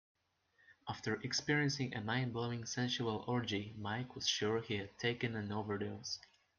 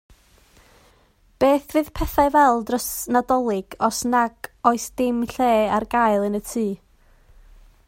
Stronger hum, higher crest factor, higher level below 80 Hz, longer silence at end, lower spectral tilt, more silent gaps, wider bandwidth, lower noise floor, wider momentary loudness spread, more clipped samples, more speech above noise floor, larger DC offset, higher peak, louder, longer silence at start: neither; about the same, 20 dB vs 20 dB; second, -74 dBFS vs -42 dBFS; second, 0.4 s vs 1.1 s; about the same, -4.5 dB/octave vs -4.5 dB/octave; neither; second, 10 kHz vs 16.5 kHz; first, -75 dBFS vs -57 dBFS; about the same, 8 LU vs 7 LU; neither; about the same, 36 dB vs 37 dB; neither; second, -20 dBFS vs -2 dBFS; second, -39 LUFS vs -21 LUFS; second, 0.7 s vs 1.4 s